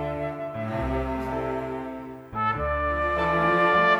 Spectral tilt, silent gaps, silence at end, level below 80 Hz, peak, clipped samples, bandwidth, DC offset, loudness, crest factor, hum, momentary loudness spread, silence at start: -7 dB/octave; none; 0 s; -40 dBFS; -8 dBFS; under 0.1%; 15 kHz; under 0.1%; -26 LUFS; 16 dB; none; 13 LU; 0 s